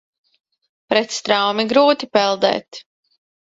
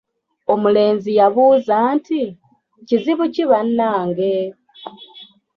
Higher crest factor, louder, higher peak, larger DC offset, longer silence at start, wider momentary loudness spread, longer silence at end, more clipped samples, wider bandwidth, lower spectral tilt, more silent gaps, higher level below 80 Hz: first, 20 dB vs 14 dB; about the same, -17 LUFS vs -17 LUFS; about the same, 0 dBFS vs -2 dBFS; neither; first, 0.9 s vs 0.5 s; second, 11 LU vs 15 LU; first, 0.6 s vs 0.3 s; neither; first, 7.8 kHz vs 6.4 kHz; second, -3 dB/octave vs -8 dB/octave; neither; about the same, -64 dBFS vs -64 dBFS